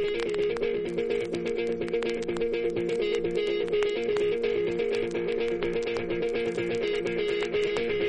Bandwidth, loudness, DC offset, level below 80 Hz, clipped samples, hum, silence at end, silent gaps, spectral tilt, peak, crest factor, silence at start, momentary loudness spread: 10 kHz; -28 LUFS; under 0.1%; -50 dBFS; under 0.1%; none; 0 s; none; -5.5 dB/octave; -8 dBFS; 20 dB; 0 s; 3 LU